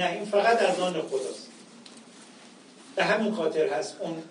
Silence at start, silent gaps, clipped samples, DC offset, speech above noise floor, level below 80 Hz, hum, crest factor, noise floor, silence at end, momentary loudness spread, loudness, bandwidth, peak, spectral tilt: 0 s; none; under 0.1%; under 0.1%; 24 dB; -84 dBFS; none; 18 dB; -51 dBFS; 0 s; 25 LU; -27 LUFS; 10.5 kHz; -10 dBFS; -4 dB/octave